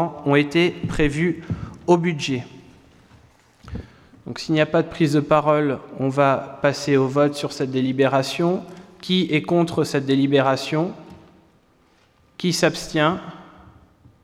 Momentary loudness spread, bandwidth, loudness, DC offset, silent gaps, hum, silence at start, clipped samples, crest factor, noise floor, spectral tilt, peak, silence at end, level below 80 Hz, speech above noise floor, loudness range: 14 LU; 15 kHz; -21 LUFS; under 0.1%; none; none; 0 s; under 0.1%; 18 dB; -58 dBFS; -6 dB/octave; -4 dBFS; 0.8 s; -46 dBFS; 38 dB; 5 LU